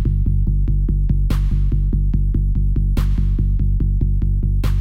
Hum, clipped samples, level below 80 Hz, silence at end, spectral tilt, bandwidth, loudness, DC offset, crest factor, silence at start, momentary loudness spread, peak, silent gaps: none; under 0.1%; -16 dBFS; 0 s; -9 dB/octave; 5 kHz; -20 LUFS; under 0.1%; 10 dB; 0 s; 1 LU; -6 dBFS; none